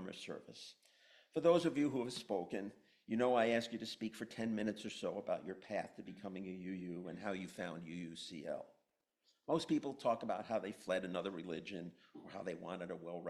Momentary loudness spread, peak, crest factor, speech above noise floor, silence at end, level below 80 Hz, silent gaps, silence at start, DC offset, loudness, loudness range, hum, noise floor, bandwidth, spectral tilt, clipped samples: 16 LU; -20 dBFS; 22 dB; 43 dB; 0 s; -80 dBFS; none; 0 s; under 0.1%; -41 LUFS; 8 LU; none; -84 dBFS; 13.5 kHz; -5.5 dB/octave; under 0.1%